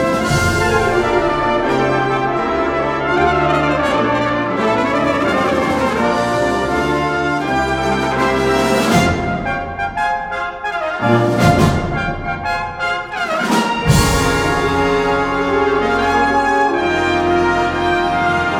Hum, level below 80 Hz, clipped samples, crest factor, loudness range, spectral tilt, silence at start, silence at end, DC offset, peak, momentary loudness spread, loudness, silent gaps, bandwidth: none; -32 dBFS; under 0.1%; 16 dB; 2 LU; -5.5 dB/octave; 0 s; 0 s; under 0.1%; 0 dBFS; 6 LU; -16 LUFS; none; 19 kHz